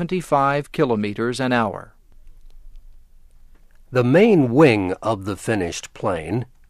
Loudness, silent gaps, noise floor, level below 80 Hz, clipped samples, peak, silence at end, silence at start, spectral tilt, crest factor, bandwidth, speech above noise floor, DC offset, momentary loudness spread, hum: -19 LUFS; none; -46 dBFS; -46 dBFS; under 0.1%; -2 dBFS; 0.25 s; 0 s; -6.5 dB/octave; 20 dB; 14 kHz; 27 dB; under 0.1%; 12 LU; none